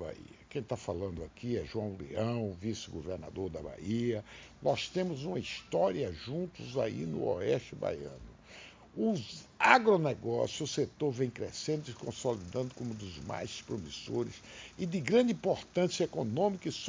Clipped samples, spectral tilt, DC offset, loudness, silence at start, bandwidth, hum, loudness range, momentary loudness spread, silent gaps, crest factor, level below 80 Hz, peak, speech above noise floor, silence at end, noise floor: under 0.1%; -5.5 dB/octave; under 0.1%; -34 LUFS; 0 s; 7.6 kHz; none; 7 LU; 13 LU; none; 28 dB; -58 dBFS; -6 dBFS; 20 dB; 0 s; -54 dBFS